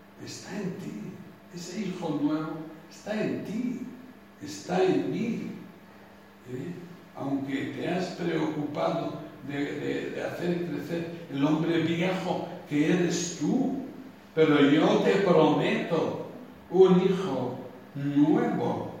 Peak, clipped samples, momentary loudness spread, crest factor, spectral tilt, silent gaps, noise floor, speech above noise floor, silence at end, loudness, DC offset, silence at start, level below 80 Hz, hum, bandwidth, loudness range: -8 dBFS; under 0.1%; 20 LU; 20 dB; -6 dB/octave; none; -51 dBFS; 25 dB; 0 s; -28 LUFS; under 0.1%; 0.15 s; -68 dBFS; none; 15.5 kHz; 9 LU